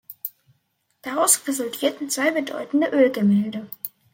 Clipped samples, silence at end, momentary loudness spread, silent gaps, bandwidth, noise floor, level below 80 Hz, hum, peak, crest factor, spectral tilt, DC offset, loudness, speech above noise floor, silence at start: under 0.1%; 0.25 s; 16 LU; none; 16.5 kHz; -70 dBFS; -74 dBFS; none; -4 dBFS; 20 dB; -3.5 dB/octave; under 0.1%; -21 LUFS; 49 dB; 0.1 s